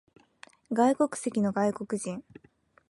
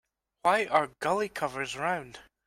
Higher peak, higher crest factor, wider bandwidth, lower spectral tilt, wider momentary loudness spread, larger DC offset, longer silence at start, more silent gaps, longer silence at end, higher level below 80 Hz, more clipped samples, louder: second, -12 dBFS vs -8 dBFS; about the same, 18 dB vs 22 dB; second, 11.5 kHz vs 16 kHz; first, -6 dB/octave vs -4 dB/octave; about the same, 10 LU vs 8 LU; neither; first, 0.7 s vs 0.45 s; neither; first, 0.7 s vs 0.25 s; second, -72 dBFS vs -66 dBFS; neither; about the same, -28 LUFS vs -29 LUFS